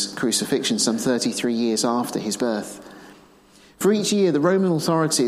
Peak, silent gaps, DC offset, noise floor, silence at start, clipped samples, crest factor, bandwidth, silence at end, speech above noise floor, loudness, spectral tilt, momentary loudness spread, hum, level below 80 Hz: -8 dBFS; none; under 0.1%; -52 dBFS; 0 s; under 0.1%; 14 dB; 15.5 kHz; 0 s; 31 dB; -21 LUFS; -4 dB/octave; 6 LU; none; -64 dBFS